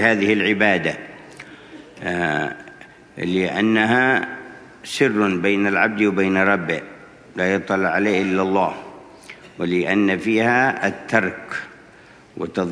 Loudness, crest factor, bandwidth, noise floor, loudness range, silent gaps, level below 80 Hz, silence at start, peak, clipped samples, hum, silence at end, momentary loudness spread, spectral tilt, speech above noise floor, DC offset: -19 LUFS; 20 dB; 11 kHz; -47 dBFS; 3 LU; none; -60 dBFS; 0 s; 0 dBFS; under 0.1%; none; 0 s; 23 LU; -5.5 dB/octave; 28 dB; under 0.1%